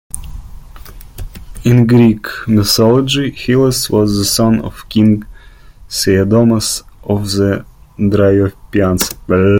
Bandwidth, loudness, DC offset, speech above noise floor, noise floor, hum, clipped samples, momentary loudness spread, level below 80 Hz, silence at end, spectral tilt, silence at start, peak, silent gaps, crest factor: 17 kHz; -13 LUFS; under 0.1%; 26 dB; -37 dBFS; none; under 0.1%; 12 LU; -34 dBFS; 0 s; -5.5 dB/octave; 0.15 s; 0 dBFS; none; 12 dB